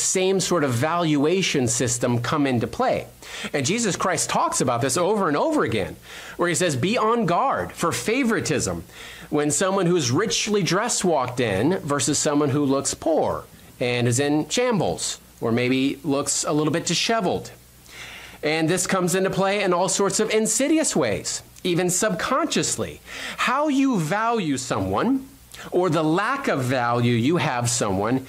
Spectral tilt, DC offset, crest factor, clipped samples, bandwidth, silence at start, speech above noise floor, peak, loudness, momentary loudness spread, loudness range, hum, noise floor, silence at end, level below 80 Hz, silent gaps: -4 dB/octave; under 0.1%; 12 dB; under 0.1%; 16 kHz; 0 s; 21 dB; -10 dBFS; -22 LUFS; 7 LU; 2 LU; none; -43 dBFS; 0 s; -54 dBFS; none